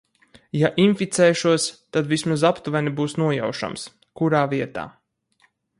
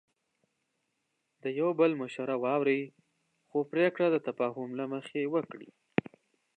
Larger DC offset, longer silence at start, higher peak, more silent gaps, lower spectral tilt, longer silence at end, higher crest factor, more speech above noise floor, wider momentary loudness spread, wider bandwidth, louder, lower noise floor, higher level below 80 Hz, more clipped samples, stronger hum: neither; second, 0.55 s vs 1.45 s; first, -4 dBFS vs -8 dBFS; neither; second, -5 dB/octave vs -7.5 dB/octave; about the same, 0.9 s vs 0.85 s; second, 18 dB vs 24 dB; second, 43 dB vs 50 dB; about the same, 12 LU vs 10 LU; first, 11.5 kHz vs 9 kHz; first, -21 LUFS vs -31 LUFS; second, -64 dBFS vs -81 dBFS; first, -62 dBFS vs -78 dBFS; neither; neither